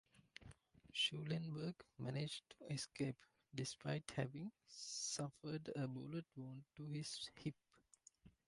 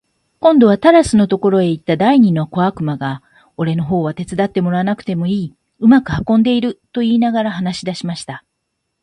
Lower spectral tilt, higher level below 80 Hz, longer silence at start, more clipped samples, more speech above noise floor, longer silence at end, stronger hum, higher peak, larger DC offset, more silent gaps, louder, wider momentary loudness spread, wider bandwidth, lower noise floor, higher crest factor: second, -4 dB/octave vs -7 dB/octave; second, -78 dBFS vs -46 dBFS; second, 0.15 s vs 0.4 s; neither; second, 25 dB vs 59 dB; second, 0.15 s vs 0.65 s; neither; second, -28 dBFS vs 0 dBFS; neither; neither; second, -47 LUFS vs -15 LUFS; first, 17 LU vs 12 LU; about the same, 11.5 kHz vs 11.5 kHz; about the same, -72 dBFS vs -72 dBFS; first, 20 dB vs 14 dB